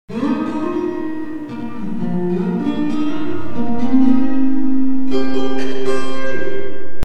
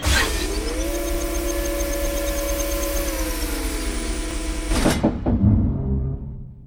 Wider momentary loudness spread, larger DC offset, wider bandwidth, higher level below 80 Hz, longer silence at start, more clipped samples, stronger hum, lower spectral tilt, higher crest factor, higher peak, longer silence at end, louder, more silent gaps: first, 11 LU vs 8 LU; neither; second, 9 kHz vs over 20 kHz; second, -46 dBFS vs -26 dBFS; about the same, 0.05 s vs 0 s; neither; neither; first, -7.5 dB/octave vs -4.5 dB/octave; second, 10 dB vs 16 dB; first, 0 dBFS vs -6 dBFS; about the same, 0 s vs 0 s; first, -20 LUFS vs -23 LUFS; neither